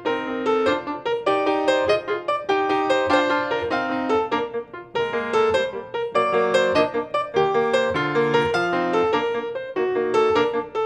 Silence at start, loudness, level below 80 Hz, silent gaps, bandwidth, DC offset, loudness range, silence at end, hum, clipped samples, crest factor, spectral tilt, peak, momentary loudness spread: 0 s; -22 LUFS; -56 dBFS; none; 10 kHz; under 0.1%; 2 LU; 0 s; none; under 0.1%; 18 dB; -5 dB/octave; -4 dBFS; 6 LU